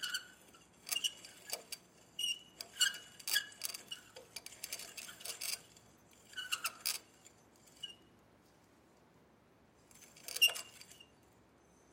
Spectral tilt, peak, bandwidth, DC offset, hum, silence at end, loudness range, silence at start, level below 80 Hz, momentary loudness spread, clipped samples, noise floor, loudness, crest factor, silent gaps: 2 dB/octave; -16 dBFS; 16.5 kHz; under 0.1%; none; 0.85 s; 7 LU; 0 s; -82 dBFS; 21 LU; under 0.1%; -67 dBFS; -39 LUFS; 28 dB; none